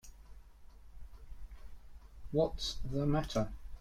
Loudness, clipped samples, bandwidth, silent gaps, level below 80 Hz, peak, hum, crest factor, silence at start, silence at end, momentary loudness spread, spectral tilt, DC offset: -36 LUFS; under 0.1%; 15 kHz; none; -48 dBFS; -18 dBFS; none; 20 dB; 0.05 s; 0 s; 24 LU; -6 dB/octave; under 0.1%